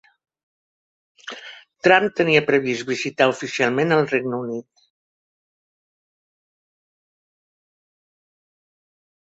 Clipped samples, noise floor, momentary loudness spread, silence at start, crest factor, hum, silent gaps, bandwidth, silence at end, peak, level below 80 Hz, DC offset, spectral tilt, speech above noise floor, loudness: under 0.1%; -42 dBFS; 20 LU; 1.25 s; 24 dB; none; none; 8 kHz; 4.75 s; 0 dBFS; -66 dBFS; under 0.1%; -5 dB/octave; 23 dB; -19 LUFS